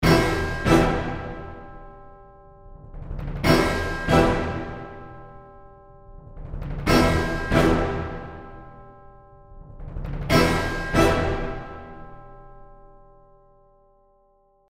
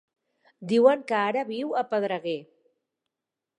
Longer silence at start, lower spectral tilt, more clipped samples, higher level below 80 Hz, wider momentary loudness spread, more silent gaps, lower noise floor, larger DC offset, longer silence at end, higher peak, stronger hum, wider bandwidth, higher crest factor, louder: second, 0 s vs 0.6 s; about the same, -6 dB/octave vs -6 dB/octave; neither; first, -34 dBFS vs -82 dBFS; first, 24 LU vs 13 LU; neither; second, -61 dBFS vs -88 dBFS; neither; first, 1.95 s vs 1.15 s; about the same, -4 dBFS vs -6 dBFS; neither; first, 16 kHz vs 10.5 kHz; about the same, 20 dB vs 22 dB; first, -22 LUFS vs -25 LUFS